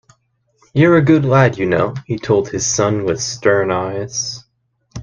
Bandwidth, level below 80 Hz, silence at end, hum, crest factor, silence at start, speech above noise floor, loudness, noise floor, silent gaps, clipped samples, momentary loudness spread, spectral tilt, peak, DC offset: 10 kHz; -48 dBFS; 0 s; none; 16 dB; 0.75 s; 49 dB; -16 LUFS; -64 dBFS; none; under 0.1%; 11 LU; -5 dB/octave; 0 dBFS; under 0.1%